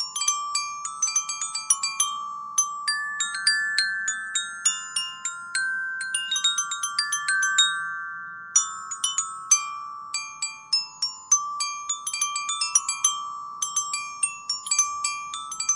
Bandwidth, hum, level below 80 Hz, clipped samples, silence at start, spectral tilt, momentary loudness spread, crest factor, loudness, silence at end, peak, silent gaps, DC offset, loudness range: 11.5 kHz; none; -78 dBFS; under 0.1%; 0 s; 4.5 dB/octave; 10 LU; 22 dB; -24 LUFS; 0 s; -4 dBFS; none; under 0.1%; 2 LU